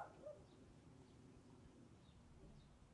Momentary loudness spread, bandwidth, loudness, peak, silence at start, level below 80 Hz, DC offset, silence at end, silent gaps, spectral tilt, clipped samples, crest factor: 7 LU; 10.5 kHz; -64 LUFS; -42 dBFS; 0 s; -72 dBFS; under 0.1%; 0 s; none; -6.5 dB/octave; under 0.1%; 22 dB